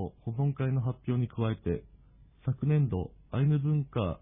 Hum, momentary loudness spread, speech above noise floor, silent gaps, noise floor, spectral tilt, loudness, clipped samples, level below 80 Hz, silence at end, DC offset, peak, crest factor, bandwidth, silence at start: none; 9 LU; 28 dB; none; -58 dBFS; -12.5 dB/octave; -31 LUFS; under 0.1%; -52 dBFS; 0.05 s; under 0.1%; -16 dBFS; 14 dB; 3.8 kHz; 0 s